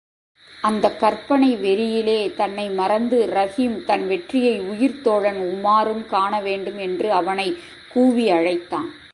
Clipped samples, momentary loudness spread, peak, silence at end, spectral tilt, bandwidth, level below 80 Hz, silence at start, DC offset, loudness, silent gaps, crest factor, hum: under 0.1%; 7 LU; -2 dBFS; 0.05 s; -5.5 dB/octave; 11.5 kHz; -60 dBFS; 0.5 s; under 0.1%; -20 LUFS; none; 18 dB; none